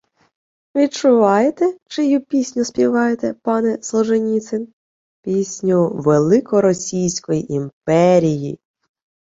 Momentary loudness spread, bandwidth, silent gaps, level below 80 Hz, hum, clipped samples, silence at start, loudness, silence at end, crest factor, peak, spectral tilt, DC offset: 11 LU; 8 kHz; 1.82-1.86 s, 4.73-5.23 s, 7.73-7.81 s; -58 dBFS; none; under 0.1%; 0.75 s; -17 LUFS; 0.8 s; 16 dB; -2 dBFS; -6 dB/octave; under 0.1%